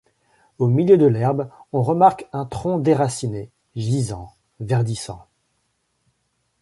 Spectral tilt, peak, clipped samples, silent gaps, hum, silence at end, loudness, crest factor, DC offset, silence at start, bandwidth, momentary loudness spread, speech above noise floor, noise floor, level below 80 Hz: -7.5 dB/octave; -2 dBFS; under 0.1%; none; none; 1.45 s; -20 LUFS; 18 dB; under 0.1%; 0.6 s; 11.5 kHz; 19 LU; 51 dB; -70 dBFS; -52 dBFS